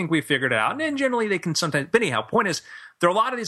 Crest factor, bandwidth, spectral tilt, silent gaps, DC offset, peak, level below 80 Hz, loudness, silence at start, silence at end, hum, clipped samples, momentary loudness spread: 18 dB; 13 kHz; -4 dB/octave; none; under 0.1%; -4 dBFS; -64 dBFS; -22 LUFS; 0 s; 0 s; none; under 0.1%; 3 LU